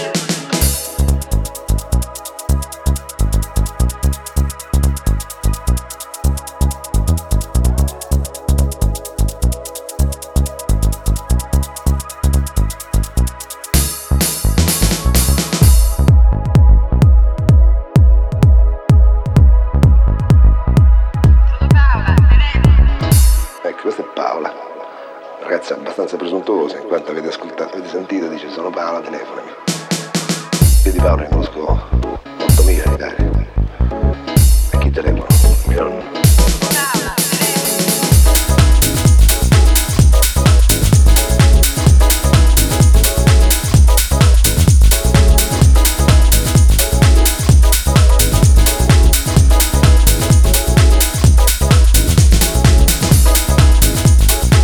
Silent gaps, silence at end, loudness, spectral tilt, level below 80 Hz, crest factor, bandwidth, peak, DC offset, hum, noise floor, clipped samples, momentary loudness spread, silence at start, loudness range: none; 0 s; -13 LUFS; -5 dB/octave; -14 dBFS; 12 dB; over 20 kHz; 0 dBFS; under 0.1%; none; -32 dBFS; under 0.1%; 10 LU; 0 s; 8 LU